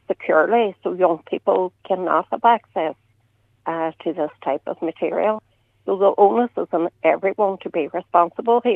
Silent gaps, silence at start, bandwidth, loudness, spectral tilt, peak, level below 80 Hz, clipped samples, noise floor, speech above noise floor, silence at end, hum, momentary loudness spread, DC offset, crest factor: none; 0.1 s; 4 kHz; -20 LUFS; -8 dB/octave; -2 dBFS; -72 dBFS; under 0.1%; -62 dBFS; 42 dB; 0 s; none; 9 LU; under 0.1%; 18 dB